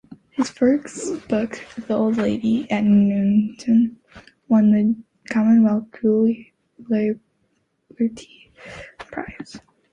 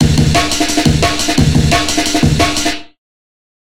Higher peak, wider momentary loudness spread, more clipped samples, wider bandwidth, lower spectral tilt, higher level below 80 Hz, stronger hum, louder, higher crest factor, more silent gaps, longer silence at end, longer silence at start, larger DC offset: second, -8 dBFS vs 0 dBFS; first, 18 LU vs 3 LU; neither; second, 9.4 kHz vs 16.5 kHz; first, -7 dB/octave vs -4 dB/octave; second, -56 dBFS vs -24 dBFS; neither; second, -20 LUFS vs -12 LUFS; about the same, 14 dB vs 14 dB; neither; second, 0.35 s vs 0.75 s; first, 0.4 s vs 0 s; second, under 0.1% vs 5%